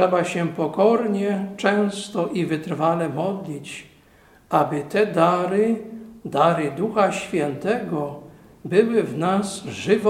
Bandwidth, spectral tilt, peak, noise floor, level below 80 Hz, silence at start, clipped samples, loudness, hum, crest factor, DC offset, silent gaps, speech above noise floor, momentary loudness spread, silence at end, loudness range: 15 kHz; -6 dB/octave; -2 dBFS; -53 dBFS; -62 dBFS; 0 s; under 0.1%; -22 LUFS; none; 20 dB; under 0.1%; none; 32 dB; 12 LU; 0 s; 3 LU